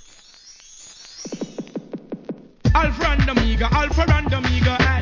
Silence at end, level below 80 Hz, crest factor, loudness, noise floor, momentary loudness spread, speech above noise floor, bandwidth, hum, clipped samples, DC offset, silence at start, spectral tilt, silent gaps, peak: 0 s; -24 dBFS; 16 dB; -20 LUFS; -46 dBFS; 20 LU; 29 dB; 7.4 kHz; none; under 0.1%; under 0.1%; 0.45 s; -6 dB/octave; none; -4 dBFS